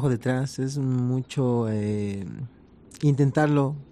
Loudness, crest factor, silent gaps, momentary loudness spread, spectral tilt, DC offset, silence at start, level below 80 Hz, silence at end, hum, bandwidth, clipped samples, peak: -25 LUFS; 14 dB; none; 12 LU; -7.5 dB/octave; under 0.1%; 0 s; -58 dBFS; 0.05 s; none; 11.5 kHz; under 0.1%; -10 dBFS